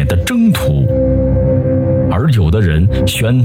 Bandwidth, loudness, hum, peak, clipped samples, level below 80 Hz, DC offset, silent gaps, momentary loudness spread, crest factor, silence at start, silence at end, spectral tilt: 16.5 kHz; -13 LUFS; none; -2 dBFS; under 0.1%; -22 dBFS; under 0.1%; none; 2 LU; 8 dB; 0 s; 0 s; -7 dB/octave